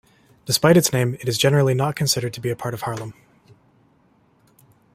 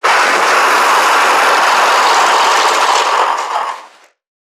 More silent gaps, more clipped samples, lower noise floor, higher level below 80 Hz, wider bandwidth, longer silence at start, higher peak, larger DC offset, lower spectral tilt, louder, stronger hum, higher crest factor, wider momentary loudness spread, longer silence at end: neither; neither; first, -59 dBFS vs -40 dBFS; first, -56 dBFS vs -74 dBFS; second, 16 kHz vs 19 kHz; first, 0.45 s vs 0.05 s; about the same, -2 dBFS vs 0 dBFS; neither; first, -4.5 dB/octave vs 1 dB/octave; second, -20 LUFS vs -10 LUFS; neither; first, 20 dB vs 12 dB; first, 14 LU vs 8 LU; first, 1.8 s vs 0.65 s